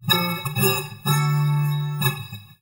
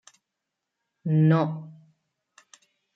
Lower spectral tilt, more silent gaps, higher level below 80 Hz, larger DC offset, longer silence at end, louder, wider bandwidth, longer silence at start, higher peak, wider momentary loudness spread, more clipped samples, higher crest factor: second, -4.5 dB/octave vs -9 dB/octave; neither; first, -60 dBFS vs -74 dBFS; neither; second, 0.15 s vs 1.25 s; about the same, -22 LUFS vs -24 LUFS; first, over 20 kHz vs 7.6 kHz; second, 0 s vs 1.05 s; first, -4 dBFS vs -10 dBFS; second, 4 LU vs 19 LU; neither; about the same, 18 dB vs 18 dB